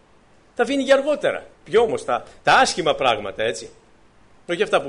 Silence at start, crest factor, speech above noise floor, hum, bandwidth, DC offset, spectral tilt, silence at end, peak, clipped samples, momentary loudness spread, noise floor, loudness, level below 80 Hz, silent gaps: 0.6 s; 16 dB; 33 dB; none; 10.5 kHz; under 0.1%; -3 dB/octave; 0 s; -6 dBFS; under 0.1%; 11 LU; -53 dBFS; -20 LUFS; -54 dBFS; none